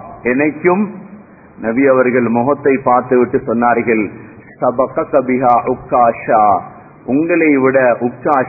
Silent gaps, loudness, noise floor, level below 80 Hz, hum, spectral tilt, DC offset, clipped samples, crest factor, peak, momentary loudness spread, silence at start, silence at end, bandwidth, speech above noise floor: none; -13 LUFS; -38 dBFS; -50 dBFS; none; -12 dB/octave; under 0.1%; under 0.1%; 14 dB; 0 dBFS; 7 LU; 0 s; 0 s; 2.7 kHz; 25 dB